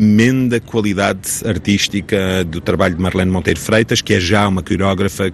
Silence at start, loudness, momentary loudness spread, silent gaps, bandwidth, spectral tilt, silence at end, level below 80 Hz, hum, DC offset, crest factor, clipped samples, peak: 0 s; -15 LUFS; 5 LU; none; 13.5 kHz; -5 dB/octave; 0 s; -40 dBFS; none; under 0.1%; 14 dB; under 0.1%; 0 dBFS